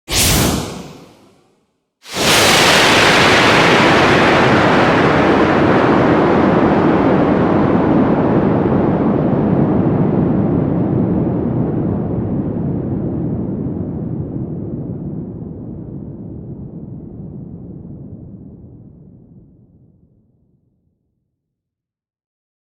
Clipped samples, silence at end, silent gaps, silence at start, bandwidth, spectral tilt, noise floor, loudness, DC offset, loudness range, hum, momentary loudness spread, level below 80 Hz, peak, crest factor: under 0.1%; 3.85 s; none; 0.1 s; over 20 kHz; -4.5 dB/octave; -83 dBFS; -13 LUFS; under 0.1%; 20 LU; none; 22 LU; -36 dBFS; 0 dBFS; 16 dB